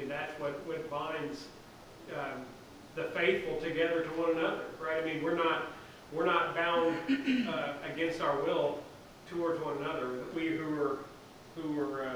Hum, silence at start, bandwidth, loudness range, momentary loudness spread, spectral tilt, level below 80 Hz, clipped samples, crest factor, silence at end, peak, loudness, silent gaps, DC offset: none; 0 s; over 20 kHz; 5 LU; 16 LU; -5.5 dB/octave; -64 dBFS; under 0.1%; 20 dB; 0 s; -14 dBFS; -34 LUFS; none; under 0.1%